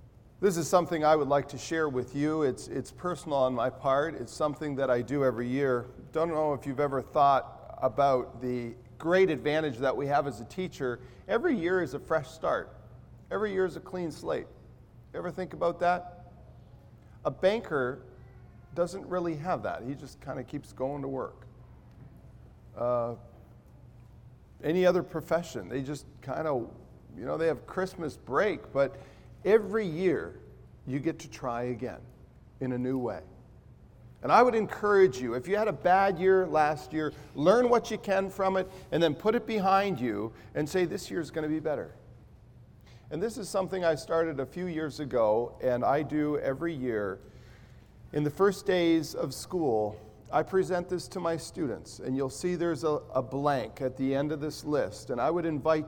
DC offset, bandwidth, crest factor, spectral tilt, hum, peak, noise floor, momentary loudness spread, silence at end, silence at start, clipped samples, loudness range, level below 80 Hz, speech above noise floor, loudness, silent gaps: under 0.1%; 18 kHz; 22 dB; -6 dB/octave; none; -8 dBFS; -54 dBFS; 12 LU; 0 s; 0 s; under 0.1%; 8 LU; -58 dBFS; 25 dB; -30 LUFS; none